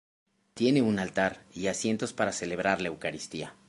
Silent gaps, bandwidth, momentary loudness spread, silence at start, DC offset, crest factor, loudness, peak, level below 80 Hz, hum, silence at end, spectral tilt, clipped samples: none; 11.5 kHz; 10 LU; 0.55 s; under 0.1%; 20 dB; -29 LUFS; -10 dBFS; -62 dBFS; none; 0.15 s; -4.5 dB/octave; under 0.1%